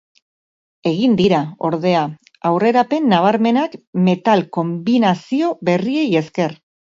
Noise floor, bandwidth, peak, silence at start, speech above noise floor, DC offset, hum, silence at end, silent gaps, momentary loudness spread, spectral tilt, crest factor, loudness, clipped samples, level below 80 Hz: under -90 dBFS; 7.6 kHz; 0 dBFS; 0.85 s; over 74 dB; under 0.1%; none; 0.4 s; 3.87-3.93 s; 8 LU; -7 dB/octave; 16 dB; -17 LUFS; under 0.1%; -60 dBFS